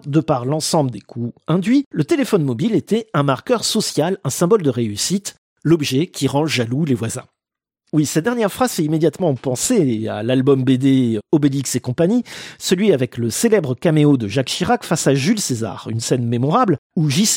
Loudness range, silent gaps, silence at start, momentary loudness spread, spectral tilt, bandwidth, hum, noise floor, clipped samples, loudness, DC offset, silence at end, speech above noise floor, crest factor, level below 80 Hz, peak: 3 LU; 1.86-1.91 s, 5.38-5.56 s, 16.78-16.90 s; 0.05 s; 6 LU; -5 dB/octave; 16.5 kHz; none; -87 dBFS; under 0.1%; -18 LUFS; under 0.1%; 0 s; 70 dB; 16 dB; -56 dBFS; -2 dBFS